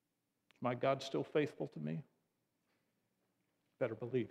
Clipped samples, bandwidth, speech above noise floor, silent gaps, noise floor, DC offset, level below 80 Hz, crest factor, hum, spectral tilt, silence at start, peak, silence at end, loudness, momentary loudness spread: under 0.1%; 13.5 kHz; 47 dB; none; -86 dBFS; under 0.1%; -86 dBFS; 20 dB; none; -6.5 dB/octave; 0.6 s; -22 dBFS; 0 s; -40 LUFS; 8 LU